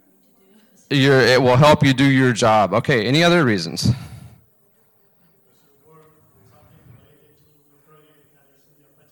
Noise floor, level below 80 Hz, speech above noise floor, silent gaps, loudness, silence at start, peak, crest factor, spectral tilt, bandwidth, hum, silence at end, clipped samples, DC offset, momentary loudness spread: -59 dBFS; -50 dBFS; 44 dB; none; -15 LUFS; 0.9 s; -2 dBFS; 18 dB; -5.5 dB/octave; 19 kHz; none; 4.85 s; under 0.1%; under 0.1%; 9 LU